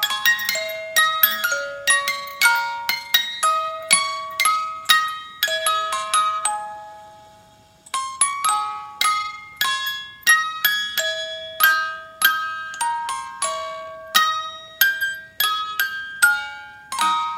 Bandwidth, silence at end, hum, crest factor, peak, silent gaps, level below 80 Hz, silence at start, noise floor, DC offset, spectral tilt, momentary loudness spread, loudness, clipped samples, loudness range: 17 kHz; 0 s; none; 22 dB; 0 dBFS; none; -66 dBFS; 0 s; -51 dBFS; under 0.1%; 2 dB/octave; 11 LU; -20 LUFS; under 0.1%; 4 LU